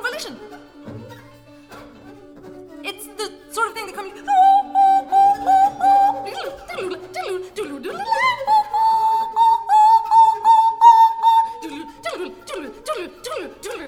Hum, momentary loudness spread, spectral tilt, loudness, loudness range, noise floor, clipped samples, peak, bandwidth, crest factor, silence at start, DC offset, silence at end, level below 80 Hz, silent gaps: none; 18 LU; -3 dB/octave; -16 LUFS; 16 LU; -45 dBFS; under 0.1%; 0 dBFS; 16 kHz; 18 dB; 0 s; under 0.1%; 0 s; -58 dBFS; none